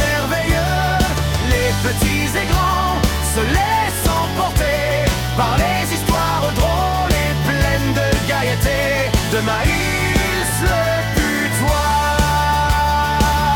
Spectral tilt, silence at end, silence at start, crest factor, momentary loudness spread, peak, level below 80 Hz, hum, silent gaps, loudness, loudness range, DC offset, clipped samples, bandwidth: -4.5 dB/octave; 0 s; 0 s; 14 dB; 2 LU; -2 dBFS; -24 dBFS; none; none; -17 LUFS; 1 LU; under 0.1%; under 0.1%; 18 kHz